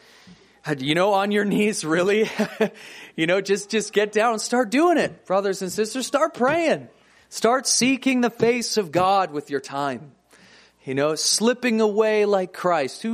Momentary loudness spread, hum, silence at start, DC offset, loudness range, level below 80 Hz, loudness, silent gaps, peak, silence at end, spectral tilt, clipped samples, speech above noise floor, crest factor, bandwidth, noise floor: 9 LU; none; 0.3 s; under 0.1%; 2 LU; -68 dBFS; -21 LUFS; none; -4 dBFS; 0 s; -3.5 dB/octave; under 0.1%; 31 dB; 18 dB; 15.5 kHz; -52 dBFS